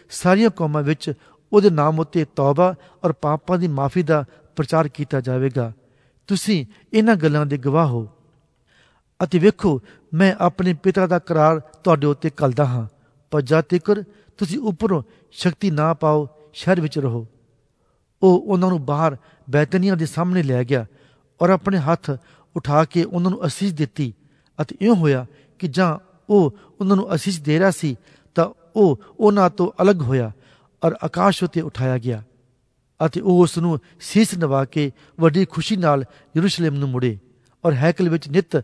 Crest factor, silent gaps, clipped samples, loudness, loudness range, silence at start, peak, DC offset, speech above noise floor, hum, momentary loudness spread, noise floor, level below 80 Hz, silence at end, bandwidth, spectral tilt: 18 dB; none; under 0.1%; -20 LUFS; 3 LU; 0.1 s; -2 dBFS; under 0.1%; 46 dB; none; 10 LU; -64 dBFS; -56 dBFS; 0 s; 11 kHz; -7 dB/octave